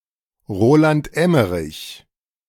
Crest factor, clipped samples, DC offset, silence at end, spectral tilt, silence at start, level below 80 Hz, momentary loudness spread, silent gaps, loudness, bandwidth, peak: 16 dB; under 0.1%; under 0.1%; 0.5 s; -7 dB/octave; 0.5 s; -46 dBFS; 17 LU; none; -17 LUFS; 17 kHz; -2 dBFS